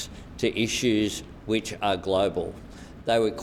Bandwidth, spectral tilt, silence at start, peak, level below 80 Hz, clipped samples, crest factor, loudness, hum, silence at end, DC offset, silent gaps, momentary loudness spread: 15.5 kHz; -4.5 dB/octave; 0 s; -10 dBFS; -48 dBFS; under 0.1%; 16 dB; -27 LUFS; none; 0 s; under 0.1%; none; 12 LU